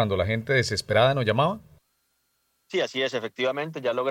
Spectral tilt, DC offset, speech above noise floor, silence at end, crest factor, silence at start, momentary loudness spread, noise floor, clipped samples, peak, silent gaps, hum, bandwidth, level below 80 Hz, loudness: -5 dB/octave; under 0.1%; 48 dB; 0 s; 18 dB; 0 s; 7 LU; -72 dBFS; under 0.1%; -6 dBFS; none; none; 16 kHz; -58 dBFS; -25 LUFS